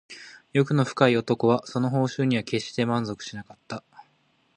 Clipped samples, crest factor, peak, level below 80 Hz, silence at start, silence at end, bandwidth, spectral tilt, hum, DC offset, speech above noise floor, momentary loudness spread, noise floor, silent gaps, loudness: under 0.1%; 24 dB; -2 dBFS; -64 dBFS; 0.1 s; 0.55 s; 10 kHz; -6.5 dB/octave; none; under 0.1%; 42 dB; 17 LU; -66 dBFS; none; -24 LUFS